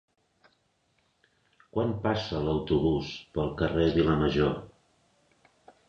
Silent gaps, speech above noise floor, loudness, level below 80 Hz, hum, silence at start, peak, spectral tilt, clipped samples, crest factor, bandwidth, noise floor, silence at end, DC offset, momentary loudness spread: none; 45 dB; -28 LUFS; -46 dBFS; none; 1.75 s; -12 dBFS; -7.5 dB/octave; under 0.1%; 18 dB; 7.4 kHz; -72 dBFS; 1.2 s; under 0.1%; 8 LU